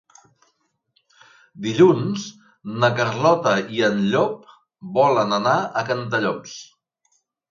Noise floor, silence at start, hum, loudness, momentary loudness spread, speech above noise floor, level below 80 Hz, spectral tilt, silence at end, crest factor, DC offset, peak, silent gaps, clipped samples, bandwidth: -69 dBFS; 1.55 s; none; -20 LUFS; 20 LU; 49 dB; -66 dBFS; -5.5 dB/octave; 0.9 s; 20 dB; under 0.1%; -2 dBFS; none; under 0.1%; 7.4 kHz